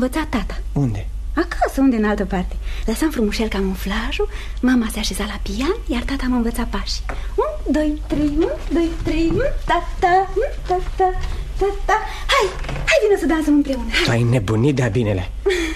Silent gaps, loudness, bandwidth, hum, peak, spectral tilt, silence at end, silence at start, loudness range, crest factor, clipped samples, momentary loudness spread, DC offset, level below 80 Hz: none; -20 LUFS; 13.5 kHz; none; -4 dBFS; -5.5 dB/octave; 0 s; 0 s; 4 LU; 14 dB; under 0.1%; 8 LU; under 0.1%; -26 dBFS